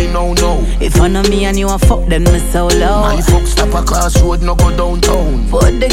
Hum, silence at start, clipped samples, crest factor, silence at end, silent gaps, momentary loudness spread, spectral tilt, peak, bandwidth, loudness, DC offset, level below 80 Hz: none; 0 s; under 0.1%; 10 dB; 0 s; none; 2 LU; -5 dB/octave; 0 dBFS; 16 kHz; -12 LUFS; under 0.1%; -12 dBFS